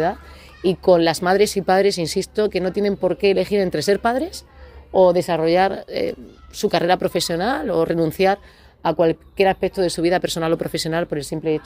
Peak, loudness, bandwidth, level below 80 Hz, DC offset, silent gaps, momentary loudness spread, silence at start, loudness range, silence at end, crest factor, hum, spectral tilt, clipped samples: -2 dBFS; -20 LUFS; 16 kHz; -46 dBFS; under 0.1%; none; 9 LU; 0 s; 2 LU; 0.05 s; 16 dB; none; -5 dB/octave; under 0.1%